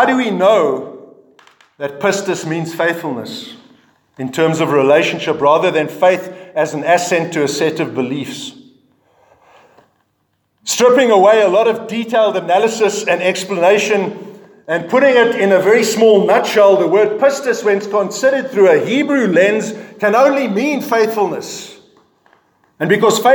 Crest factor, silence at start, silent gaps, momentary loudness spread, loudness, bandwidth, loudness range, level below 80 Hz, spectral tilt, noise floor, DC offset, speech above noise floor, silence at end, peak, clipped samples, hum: 14 dB; 0 s; none; 14 LU; -14 LUFS; 19.5 kHz; 7 LU; -68 dBFS; -4.5 dB/octave; -65 dBFS; under 0.1%; 52 dB; 0 s; 0 dBFS; under 0.1%; none